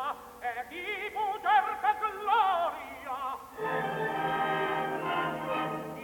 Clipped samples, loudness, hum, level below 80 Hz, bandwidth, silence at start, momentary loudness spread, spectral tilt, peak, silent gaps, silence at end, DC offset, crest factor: under 0.1%; -31 LUFS; none; -66 dBFS; 19 kHz; 0 s; 11 LU; -5 dB/octave; -14 dBFS; none; 0 s; under 0.1%; 16 dB